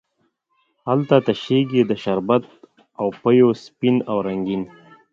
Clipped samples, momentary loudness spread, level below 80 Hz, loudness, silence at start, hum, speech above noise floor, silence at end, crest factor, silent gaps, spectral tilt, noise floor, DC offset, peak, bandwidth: under 0.1%; 11 LU; -60 dBFS; -20 LUFS; 0.85 s; none; 50 dB; 0.45 s; 20 dB; none; -8 dB/octave; -69 dBFS; under 0.1%; 0 dBFS; 7.4 kHz